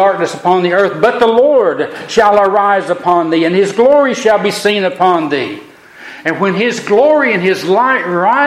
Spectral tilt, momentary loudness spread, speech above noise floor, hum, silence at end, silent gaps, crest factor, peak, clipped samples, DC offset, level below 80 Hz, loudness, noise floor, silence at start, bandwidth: -5 dB/octave; 6 LU; 23 dB; none; 0 s; none; 12 dB; 0 dBFS; under 0.1%; under 0.1%; -54 dBFS; -11 LUFS; -34 dBFS; 0 s; 15 kHz